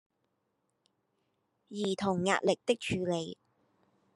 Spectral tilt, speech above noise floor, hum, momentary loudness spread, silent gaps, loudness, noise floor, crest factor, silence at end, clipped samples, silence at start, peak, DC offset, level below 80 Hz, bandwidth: -5 dB/octave; 48 dB; none; 9 LU; none; -32 LUFS; -80 dBFS; 22 dB; 0.8 s; under 0.1%; 1.7 s; -12 dBFS; under 0.1%; -70 dBFS; 12 kHz